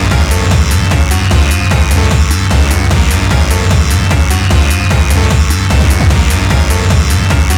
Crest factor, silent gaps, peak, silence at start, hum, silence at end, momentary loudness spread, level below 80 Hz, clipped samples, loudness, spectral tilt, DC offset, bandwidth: 8 dB; none; 0 dBFS; 0 s; none; 0 s; 1 LU; -12 dBFS; under 0.1%; -10 LUFS; -5 dB/octave; under 0.1%; 18 kHz